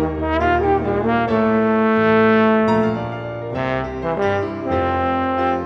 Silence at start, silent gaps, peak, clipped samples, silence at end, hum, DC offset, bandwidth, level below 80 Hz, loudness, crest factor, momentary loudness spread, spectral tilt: 0 s; none; -4 dBFS; under 0.1%; 0 s; none; under 0.1%; 6.8 kHz; -38 dBFS; -18 LUFS; 14 dB; 9 LU; -8 dB/octave